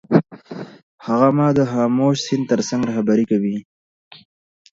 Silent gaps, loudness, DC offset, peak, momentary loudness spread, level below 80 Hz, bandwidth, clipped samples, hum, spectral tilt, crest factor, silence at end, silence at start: 0.83-0.98 s; -18 LUFS; under 0.1%; 0 dBFS; 19 LU; -58 dBFS; 7.8 kHz; under 0.1%; none; -6.5 dB/octave; 18 dB; 1.15 s; 0.1 s